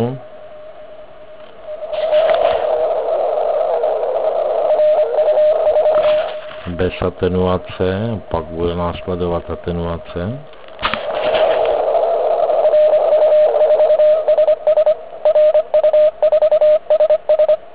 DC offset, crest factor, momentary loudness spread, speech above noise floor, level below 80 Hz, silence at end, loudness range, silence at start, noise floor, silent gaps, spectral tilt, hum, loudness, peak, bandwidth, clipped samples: 1%; 14 dB; 11 LU; 18 dB; -40 dBFS; 0.05 s; 7 LU; 0 s; -38 dBFS; none; -9.5 dB/octave; none; -15 LUFS; -2 dBFS; 4 kHz; under 0.1%